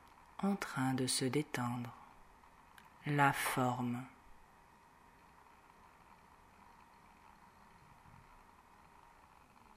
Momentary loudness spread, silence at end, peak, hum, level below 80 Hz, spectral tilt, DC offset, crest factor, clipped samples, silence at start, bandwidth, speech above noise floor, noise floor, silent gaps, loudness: 29 LU; 1.4 s; -18 dBFS; none; -70 dBFS; -4.5 dB/octave; under 0.1%; 24 dB; under 0.1%; 0.4 s; 16 kHz; 28 dB; -64 dBFS; none; -37 LUFS